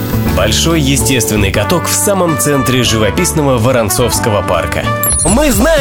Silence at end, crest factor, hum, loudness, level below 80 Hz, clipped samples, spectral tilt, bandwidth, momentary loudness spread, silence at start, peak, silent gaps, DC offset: 0 s; 10 dB; none; -11 LUFS; -24 dBFS; under 0.1%; -4 dB/octave; 18 kHz; 3 LU; 0 s; 0 dBFS; none; under 0.1%